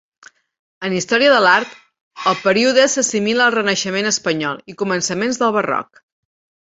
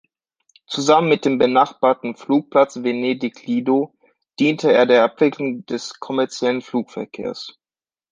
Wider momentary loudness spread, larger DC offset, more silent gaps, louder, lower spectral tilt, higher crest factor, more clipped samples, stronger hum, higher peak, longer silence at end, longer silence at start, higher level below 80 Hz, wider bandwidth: second, 10 LU vs 14 LU; neither; first, 2.01-2.11 s vs none; first, -16 LUFS vs -19 LUFS; second, -2.5 dB/octave vs -5 dB/octave; about the same, 18 dB vs 18 dB; neither; neither; about the same, 0 dBFS vs -2 dBFS; first, 0.9 s vs 0.6 s; about the same, 0.8 s vs 0.7 s; about the same, -62 dBFS vs -66 dBFS; second, 8.2 kHz vs 9.6 kHz